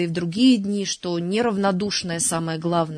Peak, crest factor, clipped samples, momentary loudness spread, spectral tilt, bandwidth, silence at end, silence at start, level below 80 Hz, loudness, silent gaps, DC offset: -8 dBFS; 14 dB; under 0.1%; 7 LU; -4.5 dB/octave; 11 kHz; 0 s; 0 s; -60 dBFS; -22 LUFS; none; under 0.1%